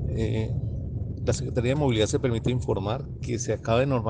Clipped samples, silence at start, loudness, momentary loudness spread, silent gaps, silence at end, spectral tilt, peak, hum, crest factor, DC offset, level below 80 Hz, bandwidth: under 0.1%; 0 s; -27 LUFS; 8 LU; none; 0 s; -6 dB/octave; -10 dBFS; none; 16 dB; under 0.1%; -38 dBFS; 9.6 kHz